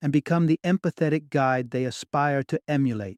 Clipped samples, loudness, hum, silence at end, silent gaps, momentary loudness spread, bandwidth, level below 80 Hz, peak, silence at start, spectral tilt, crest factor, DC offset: under 0.1%; -25 LUFS; none; 0.05 s; none; 5 LU; 11 kHz; -66 dBFS; -10 dBFS; 0 s; -7 dB/octave; 14 dB; under 0.1%